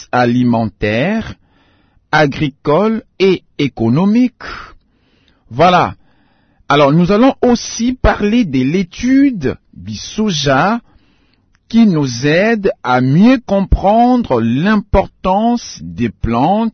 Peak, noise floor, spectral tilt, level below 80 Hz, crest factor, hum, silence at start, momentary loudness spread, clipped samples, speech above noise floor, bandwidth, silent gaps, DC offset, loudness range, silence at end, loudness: 0 dBFS; -55 dBFS; -6 dB/octave; -30 dBFS; 14 dB; none; 0 s; 10 LU; under 0.1%; 43 dB; 6.6 kHz; none; under 0.1%; 4 LU; 0.05 s; -13 LUFS